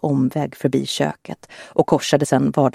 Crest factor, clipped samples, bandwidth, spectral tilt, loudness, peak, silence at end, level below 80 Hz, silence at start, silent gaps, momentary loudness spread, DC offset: 18 dB; under 0.1%; 15 kHz; -5.5 dB/octave; -19 LUFS; 0 dBFS; 0.05 s; -56 dBFS; 0.05 s; none; 14 LU; under 0.1%